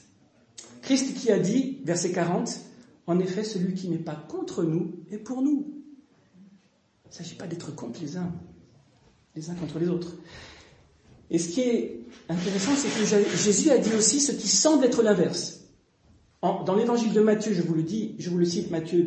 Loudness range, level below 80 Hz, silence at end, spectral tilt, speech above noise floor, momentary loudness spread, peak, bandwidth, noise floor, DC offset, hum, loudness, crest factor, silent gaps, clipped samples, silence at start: 13 LU; -66 dBFS; 0 s; -4.5 dB/octave; 39 dB; 18 LU; -8 dBFS; 8.8 kHz; -64 dBFS; under 0.1%; none; -25 LUFS; 18 dB; none; under 0.1%; 0.6 s